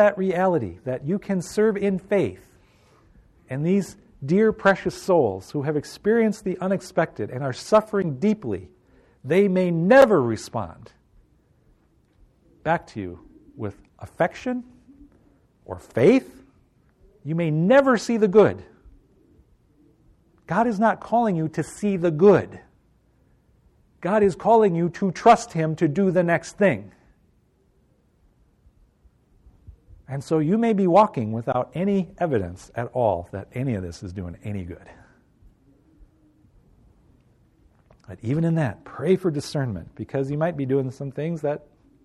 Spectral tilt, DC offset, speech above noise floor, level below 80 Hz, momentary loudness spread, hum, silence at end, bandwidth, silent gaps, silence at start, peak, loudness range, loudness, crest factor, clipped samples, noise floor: -7 dB/octave; under 0.1%; 41 dB; -56 dBFS; 17 LU; none; 0.45 s; 13 kHz; none; 0 s; -4 dBFS; 10 LU; -22 LUFS; 18 dB; under 0.1%; -62 dBFS